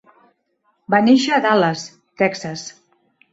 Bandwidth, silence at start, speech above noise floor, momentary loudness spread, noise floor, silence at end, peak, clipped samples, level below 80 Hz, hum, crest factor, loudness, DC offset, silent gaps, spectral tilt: 8 kHz; 0.9 s; 50 dB; 18 LU; -66 dBFS; 0.6 s; -2 dBFS; under 0.1%; -66 dBFS; none; 18 dB; -17 LUFS; under 0.1%; none; -5 dB/octave